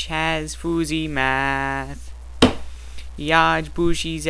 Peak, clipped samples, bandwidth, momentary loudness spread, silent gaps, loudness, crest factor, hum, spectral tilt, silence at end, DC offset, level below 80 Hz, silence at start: 0 dBFS; under 0.1%; 11 kHz; 21 LU; none; -21 LUFS; 22 dB; none; -4.5 dB/octave; 0 s; under 0.1%; -34 dBFS; 0 s